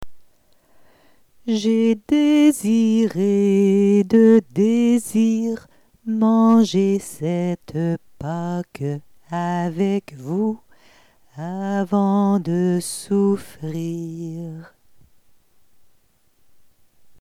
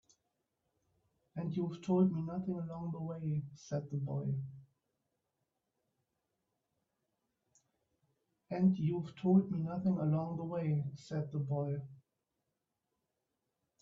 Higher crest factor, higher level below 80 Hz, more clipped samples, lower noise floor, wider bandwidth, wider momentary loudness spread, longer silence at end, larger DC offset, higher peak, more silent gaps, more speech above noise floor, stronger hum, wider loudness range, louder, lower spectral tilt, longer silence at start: second, 14 dB vs 20 dB; first, -58 dBFS vs -74 dBFS; neither; second, -58 dBFS vs -87 dBFS; first, 14 kHz vs 7.4 kHz; first, 16 LU vs 11 LU; first, 2.55 s vs 1.85 s; neither; first, -6 dBFS vs -18 dBFS; neither; second, 39 dB vs 52 dB; neither; about the same, 10 LU vs 10 LU; first, -19 LUFS vs -36 LUFS; second, -7 dB/octave vs -9.5 dB/octave; second, 0 s vs 1.35 s